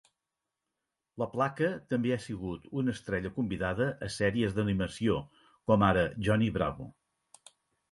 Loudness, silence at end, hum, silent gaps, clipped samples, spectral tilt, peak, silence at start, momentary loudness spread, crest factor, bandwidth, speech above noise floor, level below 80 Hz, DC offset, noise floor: -31 LUFS; 1 s; none; none; under 0.1%; -6.5 dB/octave; -10 dBFS; 1.15 s; 11 LU; 22 dB; 11.5 kHz; 58 dB; -52 dBFS; under 0.1%; -88 dBFS